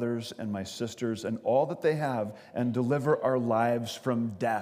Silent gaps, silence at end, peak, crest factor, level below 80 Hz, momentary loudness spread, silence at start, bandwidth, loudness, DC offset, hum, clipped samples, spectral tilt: none; 0 s; -12 dBFS; 16 dB; -74 dBFS; 8 LU; 0 s; 15.5 kHz; -30 LUFS; under 0.1%; none; under 0.1%; -6.5 dB/octave